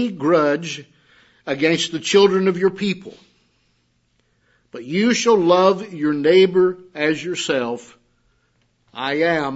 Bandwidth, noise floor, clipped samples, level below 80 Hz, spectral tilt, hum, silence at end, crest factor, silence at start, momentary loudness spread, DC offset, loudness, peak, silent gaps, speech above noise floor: 8 kHz; -65 dBFS; under 0.1%; -66 dBFS; -4.5 dB/octave; none; 0 s; 18 dB; 0 s; 16 LU; under 0.1%; -18 LUFS; -2 dBFS; none; 47 dB